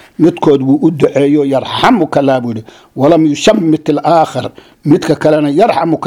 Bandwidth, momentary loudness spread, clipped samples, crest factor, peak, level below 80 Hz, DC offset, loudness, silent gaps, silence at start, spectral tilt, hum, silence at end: 12.5 kHz; 9 LU; 0.4%; 10 dB; 0 dBFS; -46 dBFS; under 0.1%; -10 LUFS; none; 0.2 s; -6.5 dB/octave; none; 0 s